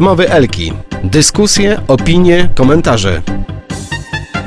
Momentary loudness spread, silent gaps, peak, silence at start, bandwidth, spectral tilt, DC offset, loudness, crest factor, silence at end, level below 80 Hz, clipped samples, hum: 13 LU; none; 0 dBFS; 0 s; 11 kHz; -4.5 dB/octave; under 0.1%; -11 LUFS; 10 dB; 0 s; -24 dBFS; 0.6%; none